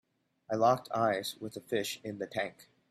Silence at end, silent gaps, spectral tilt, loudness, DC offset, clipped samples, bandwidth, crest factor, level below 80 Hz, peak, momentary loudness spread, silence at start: 0.25 s; none; -4.5 dB/octave; -33 LUFS; under 0.1%; under 0.1%; 15.5 kHz; 20 dB; -74 dBFS; -14 dBFS; 11 LU; 0.5 s